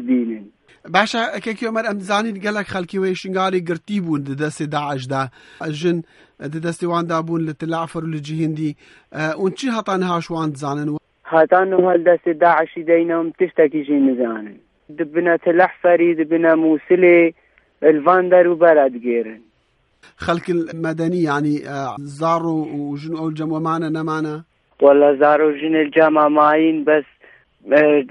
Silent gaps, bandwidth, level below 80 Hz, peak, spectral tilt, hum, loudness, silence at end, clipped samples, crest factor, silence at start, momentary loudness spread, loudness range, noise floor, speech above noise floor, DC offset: none; 11.5 kHz; -62 dBFS; 0 dBFS; -6.5 dB/octave; none; -18 LUFS; 0 s; under 0.1%; 18 dB; 0 s; 13 LU; 8 LU; -62 dBFS; 45 dB; under 0.1%